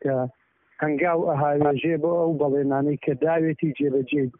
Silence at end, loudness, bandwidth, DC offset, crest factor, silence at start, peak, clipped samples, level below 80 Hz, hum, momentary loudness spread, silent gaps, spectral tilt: 0.1 s; -23 LUFS; 3.7 kHz; under 0.1%; 14 dB; 0.05 s; -10 dBFS; under 0.1%; -64 dBFS; none; 5 LU; none; -4.5 dB/octave